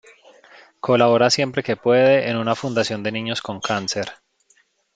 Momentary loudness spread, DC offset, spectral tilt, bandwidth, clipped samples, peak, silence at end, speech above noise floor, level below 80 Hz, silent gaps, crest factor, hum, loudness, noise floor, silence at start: 11 LU; under 0.1%; -4.5 dB/octave; 9.2 kHz; under 0.1%; -2 dBFS; 0.8 s; 42 dB; -64 dBFS; none; 18 dB; none; -19 LUFS; -61 dBFS; 0.85 s